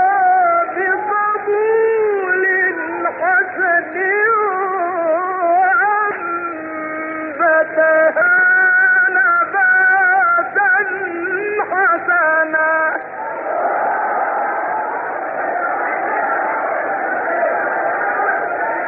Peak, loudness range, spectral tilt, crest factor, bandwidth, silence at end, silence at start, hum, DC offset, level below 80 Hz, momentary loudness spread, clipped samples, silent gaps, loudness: -4 dBFS; 7 LU; -3.5 dB/octave; 12 dB; 3.1 kHz; 0 s; 0 s; none; under 0.1%; -68 dBFS; 9 LU; under 0.1%; none; -15 LUFS